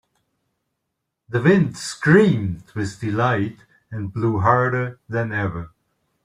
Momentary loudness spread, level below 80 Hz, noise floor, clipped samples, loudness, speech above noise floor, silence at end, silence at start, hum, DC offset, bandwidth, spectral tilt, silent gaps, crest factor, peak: 14 LU; -54 dBFS; -79 dBFS; under 0.1%; -20 LUFS; 59 dB; 0.55 s; 1.3 s; none; under 0.1%; 11.5 kHz; -7 dB/octave; none; 18 dB; -2 dBFS